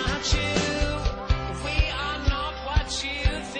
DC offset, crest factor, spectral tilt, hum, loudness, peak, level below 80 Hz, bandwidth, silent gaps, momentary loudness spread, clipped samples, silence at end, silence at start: under 0.1%; 16 dB; -4 dB/octave; none; -26 LUFS; -10 dBFS; -28 dBFS; 9.8 kHz; none; 4 LU; under 0.1%; 0 s; 0 s